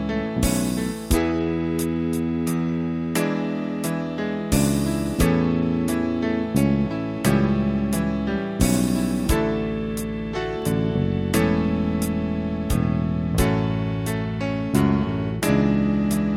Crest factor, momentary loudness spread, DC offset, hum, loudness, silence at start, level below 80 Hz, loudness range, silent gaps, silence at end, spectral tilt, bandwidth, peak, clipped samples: 18 dB; 6 LU; under 0.1%; none; -23 LUFS; 0 s; -34 dBFS; 2 LU; none; 0 s; -6 dB/octave; 16.5 kHz; -4 dBFS; under 0.1%